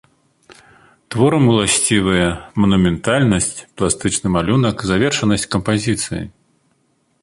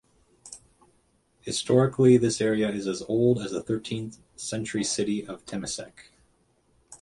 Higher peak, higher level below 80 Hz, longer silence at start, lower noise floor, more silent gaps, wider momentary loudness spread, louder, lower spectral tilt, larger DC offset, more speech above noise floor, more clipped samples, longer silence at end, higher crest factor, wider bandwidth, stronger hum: first, -2 dBFS vs -8 dBFS; first, -38 dBFS vs -60 dBFS; first, 1.1 s vs 0.45 s; second, -62 dBFS vs -67 dBFS; neither; second, 8 LU vs 23 LU; first, -16 LUFS vs -26 LUFS; about the same, -4.5 dB/octave vs -5.5 dB/octave; neither; first, 46 dB vs 41 dB; neither; first, 0.95 s vs 0.05 s; about the same, 16 dB vs 20 dB; about the same, 11.5 kHz vs 11.5 kHz; neither